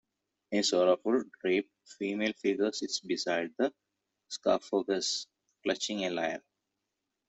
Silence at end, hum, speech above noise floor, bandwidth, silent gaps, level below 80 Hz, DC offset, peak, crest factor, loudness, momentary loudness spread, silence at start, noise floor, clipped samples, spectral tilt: 0.9 s; none; 55 dB; 8.2 kHz; none; -76 dBFS; under 0.1%; -14 dBFS; 20 dB; -31 LUFS; 10 LU; 0.5 s; -86 dBFS; under 0.1%; -3 dB/octave